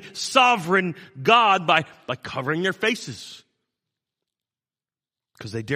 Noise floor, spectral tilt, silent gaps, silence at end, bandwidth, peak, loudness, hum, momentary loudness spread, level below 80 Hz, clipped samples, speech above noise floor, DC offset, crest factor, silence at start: under -90 dBFS; -4 dB/octave; none; 0 s; 15 kHz; -2 dBFS; -20 LUFS; none; 18 LU; -68 dBFS; under 0.1%; over 68 dB; under 0.1%; 22 dB; 0 s